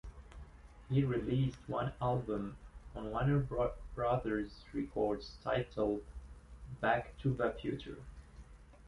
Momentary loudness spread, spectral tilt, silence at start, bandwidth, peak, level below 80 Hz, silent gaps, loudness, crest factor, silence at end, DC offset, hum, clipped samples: 21 LU; -8.5 dB/octave; 0.05 s; 11 kHz; -18 dBFS; -52 dBFS; none; -37 LUFS; 20 dB; 0 s; under 0.1%; none; under 0.1%